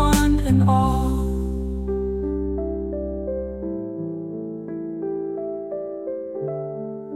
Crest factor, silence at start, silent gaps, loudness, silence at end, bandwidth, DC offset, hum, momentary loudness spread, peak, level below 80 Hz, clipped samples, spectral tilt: 16 dB; 0 s; none; -25 LUFS; 0 s; 17 kHz; under 0.1%; none; 13 LU; -6 dBFS; -30 dBFS; under 0.1%; -7 dB/octave